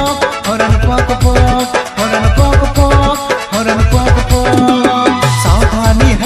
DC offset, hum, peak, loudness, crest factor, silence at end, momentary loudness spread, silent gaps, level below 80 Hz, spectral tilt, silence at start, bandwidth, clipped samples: under 0.1%; none; 0 dBFS; -11 LUFS; 10 dB; 0 s; 4 LU; none; -16 dBFS; -5.5 dB/octave; 0 s; 14.5 kHz; 0.5%